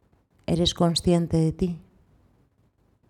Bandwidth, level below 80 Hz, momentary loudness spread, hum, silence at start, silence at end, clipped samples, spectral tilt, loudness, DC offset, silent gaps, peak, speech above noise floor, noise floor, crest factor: 13 kHz; -44 dBFS; 12 LU; none; 0.5 s; 1.3 s; under 0.1%; -6 dB/octave; -24 LUFS; under 0.1%; none; -10 dBFS; 42 dB; -65 dBFS; 16 dB